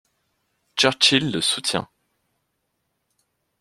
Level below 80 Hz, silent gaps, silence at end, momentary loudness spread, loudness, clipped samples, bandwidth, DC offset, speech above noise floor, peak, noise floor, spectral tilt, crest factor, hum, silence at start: -62 dBFS; none; 1.8 s; 14 LU; -19 LUFS; under 0.1%; 14 kHz; under 0.1%; 54 dB; -2 dBFS; -75 dBFS; -2.5 dB/octave; 22 dB; none; 0.75 s